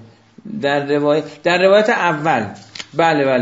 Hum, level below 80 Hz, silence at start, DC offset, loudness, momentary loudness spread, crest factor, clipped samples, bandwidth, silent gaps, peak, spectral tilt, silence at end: none; -64 dBFS; 0 s; under 0.1%; -16 LUFS; 14 LU; 16 dB; under 0.1%; 8 kHz; none; 0 dBFS; -5.5 dB/octave; 0 s